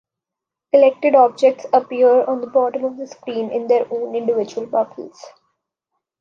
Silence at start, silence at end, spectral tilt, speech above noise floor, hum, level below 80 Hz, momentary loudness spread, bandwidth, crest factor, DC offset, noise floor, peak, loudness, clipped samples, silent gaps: 0.75 s; 0.9 s; -5.5 dB/octave; 68 dB; none; -74 dBFS; 13 LU; 7.2 kHz; 16 dB; under 0.1%; -85 dBFS; -2 dBFS; -17 LUFS; under 0.1%; none